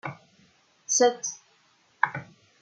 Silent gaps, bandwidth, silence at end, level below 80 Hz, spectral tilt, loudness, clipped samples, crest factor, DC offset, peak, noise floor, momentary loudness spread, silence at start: none; 10 kHz; 0.4 s; -80 dBFS; -2 dB/octave; -26 LUFS; under 0.1%; 26 dB; under 0.1%; -4 dBFS; -64 dBFS; 21 LU; 0.05 s